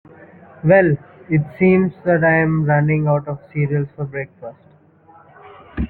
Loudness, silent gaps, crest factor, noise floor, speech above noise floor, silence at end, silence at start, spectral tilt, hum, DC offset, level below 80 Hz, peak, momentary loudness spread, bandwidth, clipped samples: -17 LUFS; none; 16 dB; -49 dBFS; 32 dB; 0.05 s; 0.65 s; -12.5 dB/octave; none; under 0.1%; -42 dBFS; -2 dBFS; 14 LU; 4 kHz; under 0.1%